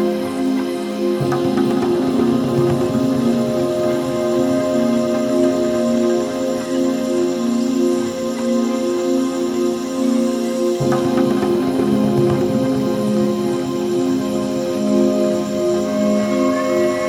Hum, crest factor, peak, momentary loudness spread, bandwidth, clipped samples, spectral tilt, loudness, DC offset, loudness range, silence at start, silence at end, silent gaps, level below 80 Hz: none; 14 dB; -4 dBFS; 4 LU; 16 kHz; under 0.1%; -6 dB/octave; -18 LUFS; under 0.1%; 1 LU; 0 s; 0 s; none; -50 dBFS